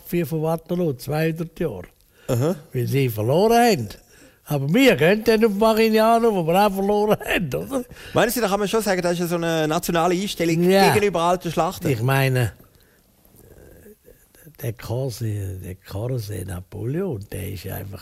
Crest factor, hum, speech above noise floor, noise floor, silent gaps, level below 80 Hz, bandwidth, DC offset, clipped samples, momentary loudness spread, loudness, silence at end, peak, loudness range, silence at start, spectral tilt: 18 dB; none; 36 dB; -56 dBFS; none; -48 dBFS; 16 kHz; under 0.1%; under 0.1%; 14 LU; -21 LUFS; 0 s; -4 dBFS; 12 LU; 0.05 s; -5.5 dB/octave